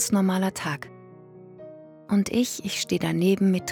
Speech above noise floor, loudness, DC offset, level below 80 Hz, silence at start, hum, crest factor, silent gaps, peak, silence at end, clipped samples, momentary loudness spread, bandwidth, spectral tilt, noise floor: 23 dB; -25 LUFS; under 0.1%; -62 dBFS; 0 s; none; 14 dB; none; -10 dBFS; 0 s; under 0.1%; 23 LU; 18 kHz; -5 dB/octave; -47 dBFS